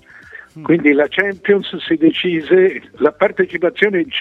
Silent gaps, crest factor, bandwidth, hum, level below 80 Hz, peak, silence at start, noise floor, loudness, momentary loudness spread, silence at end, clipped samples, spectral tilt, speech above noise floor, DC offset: none; 16 dB; 4.4 kHz; none; -60 dBFS; 0 dBFS; 0.35 s; -39 dBFS; -15 LUFS; 5 LU; 0 s; under 0.1%; -7.5 dB/octave; 24 dB; under 0.1%